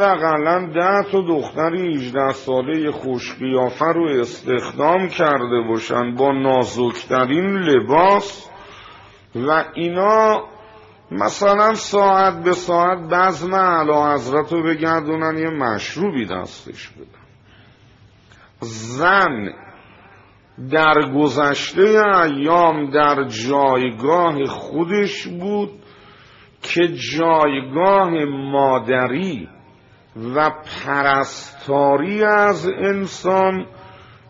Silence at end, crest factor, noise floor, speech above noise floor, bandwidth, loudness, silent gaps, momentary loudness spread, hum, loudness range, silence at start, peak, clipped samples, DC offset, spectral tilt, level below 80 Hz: 0.4 s; 16 dB; -49 dBFS; 32 dB; 7.8 kHz; -17 LUFS; none; 11 LU; none; 7 LU; 0 s; -2 dBFS; under 0.1%; under 0.1%; -4 dB/octave; -56 dBFS